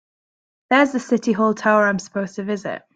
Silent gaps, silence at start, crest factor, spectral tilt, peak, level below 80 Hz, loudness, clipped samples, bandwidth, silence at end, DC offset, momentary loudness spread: none; 0.7 s; 18 dB; -5.5 dB/octave; -2 dBFS; -66 dBFS; -19 LUFS; under 0.1%; 9 kHz; 0.2 s; under 0.1%; 10 LU